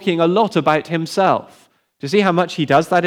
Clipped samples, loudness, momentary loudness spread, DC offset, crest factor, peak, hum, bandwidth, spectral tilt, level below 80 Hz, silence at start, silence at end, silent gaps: under 0.1%; -17 LUFS; 6 LU; under 0.1%; 14 dB; -2 dBFS; none; 15.5 kHz; -6 dB/octave; -64 dBFS; 0 s; 0 s; none